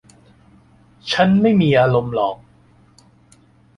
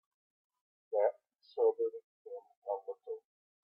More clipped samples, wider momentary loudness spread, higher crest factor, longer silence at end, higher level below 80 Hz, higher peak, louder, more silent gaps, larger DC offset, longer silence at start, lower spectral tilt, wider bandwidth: neither; second, 14 LU vs 18 LU; about the same, 18 dB vs 20 dB; first, 1.4 s vs 0.45 s; first, -52 dBFS vs under -90 dBFS; first, -2 dBFS vs -18 dBFS; first, -16 LUFS vs -36 LUFS; second, none vs 2.04-2.25 s, 2.57-2.62 s; neither; first, 1.05 s vs 0.9 s; first, -7 dB/octave vs -5.5 dB/octave; first, 10.5 kHz vs 5.4 kHz